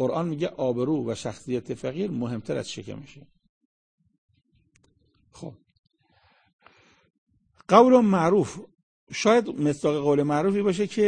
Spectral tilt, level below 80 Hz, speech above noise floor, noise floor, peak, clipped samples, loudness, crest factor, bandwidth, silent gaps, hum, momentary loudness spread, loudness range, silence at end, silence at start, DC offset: -6 dB/octave; -64 dBFS; 41 dB; -65 dBFS; -2 dBFS; under 0.1%; -24 LUFS; 24 dB; 9.8 kHz; 3.49-3.98 s, 4.18-4.29 s, 5.79-5.83 s, 6.53-6.59 s, 7.18-7.27 s, 8.83-9.07 s; none; 21 LU; 15 LU; 0 s; 0 s; under 0.1%